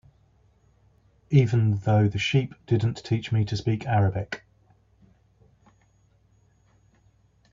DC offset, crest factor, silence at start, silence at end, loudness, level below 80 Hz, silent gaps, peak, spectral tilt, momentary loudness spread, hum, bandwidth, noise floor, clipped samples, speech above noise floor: under 0.1%; 20 dB; 1.3 s; 3.15 s; -24 LUFS; -56 dBFS; none; -6 dBFS; -7 dB/octave; 7 LU; none; 7.6 kHz; -62 dBFS; under 0.1%; 39 dB